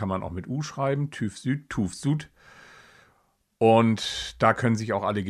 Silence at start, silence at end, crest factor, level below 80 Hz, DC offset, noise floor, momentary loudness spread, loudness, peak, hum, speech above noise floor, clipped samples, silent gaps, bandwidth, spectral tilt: 0 s; 0 s; 22 dB; -54 dBFS; under 0.1%; -68 dBFS; 11 LU; -25 LUFS; -4 dBFS; none; 43 dB; under 0.1%; none; 13 kHz; -6 dB/octave